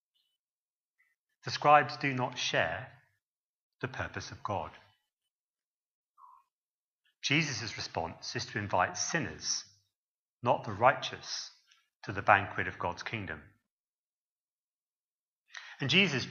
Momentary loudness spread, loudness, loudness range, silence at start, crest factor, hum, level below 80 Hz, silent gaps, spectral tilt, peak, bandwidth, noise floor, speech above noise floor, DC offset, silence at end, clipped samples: 17 LU; -31 LUFS; 12 LU; 1.45 s; 28 dB; none; -68 dBFS; 3.22-3.72 s, 5.13-5.17 s, 5.30-5.53 s, 5.66-6.15 s, 6.53-6.99 s, 9.95-10.40 s, 11.95-12.00 s, 13.70-15.46 s; -3.5 dB/octave; -8 dBFS; 7.4 kHz; under -90 dBFS; over 58 dB; under 0.1%; 0 s; under 0.1%